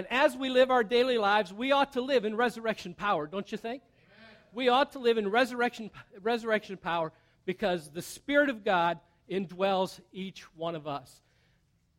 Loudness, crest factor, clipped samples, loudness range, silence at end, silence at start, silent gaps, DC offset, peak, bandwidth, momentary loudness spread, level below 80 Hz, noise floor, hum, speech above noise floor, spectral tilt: -29 LUFS; 18 dB; under 0.1%; 4 LU; 0.95 s; 0 s; none; under 0.1%; -12 dBFS; 16 kHz; 15 LU; -66 dBFS; -70 dBFS; none; 40 dB; -4.5 dB/octave